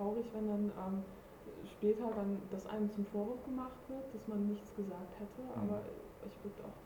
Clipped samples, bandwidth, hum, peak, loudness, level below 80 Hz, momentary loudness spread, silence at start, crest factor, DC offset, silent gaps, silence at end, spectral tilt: under 0.1%; 20 kHz; none; -22 dBFS; -41 LUFS; -64 dBFS; 13 LU; 0 s; 18 dB; under 0.1%; none; 0 s; -8.5 dB/octave